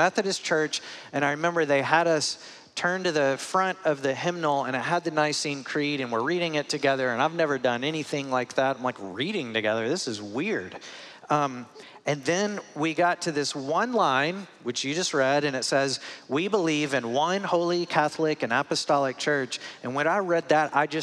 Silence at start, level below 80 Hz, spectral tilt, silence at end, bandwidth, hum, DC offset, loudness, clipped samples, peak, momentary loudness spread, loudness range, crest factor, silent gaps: 0 s; -82 dBFS; -4 dB/octave; 0 s; 13 kHz; none; under 0.1%; -26 LUFS; under 0.1%; -6 dBFS; 8 LU; 3 LU; 20 dB; none